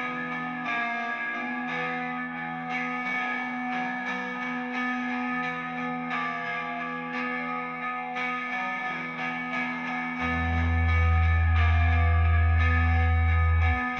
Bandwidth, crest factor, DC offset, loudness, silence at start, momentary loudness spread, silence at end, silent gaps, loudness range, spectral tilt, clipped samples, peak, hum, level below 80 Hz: 6.4 kHz; 14 dB; under 0.1%; -27 LUFS; 0 s; 8 LU; 0 s; none; 7 LU; -7.5 dB/octave; under 0.1%; -14 dBFS; none; -36 dBFS